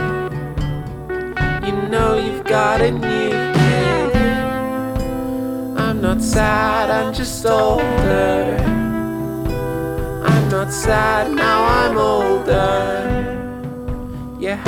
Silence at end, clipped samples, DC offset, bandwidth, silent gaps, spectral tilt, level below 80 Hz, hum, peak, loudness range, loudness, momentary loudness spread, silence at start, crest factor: 0 s; under 0.1%; under 0.1%; 18.5 kHz; none; -6 dB/octave; -30 dBFS; none; -2 dBFS; 2 LU; -18 LUFS; 9 LU; 0 s; 16 dB